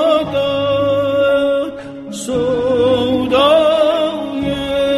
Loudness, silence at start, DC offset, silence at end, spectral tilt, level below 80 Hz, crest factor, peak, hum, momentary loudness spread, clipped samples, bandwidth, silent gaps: -15 LUFS; 0 s; under 0.1%; 0 s; -5 dB/octave; -42 dBFS; 12 dB; -2 dBFS; none; 9 LU; under 0.1%; 13 kHz; none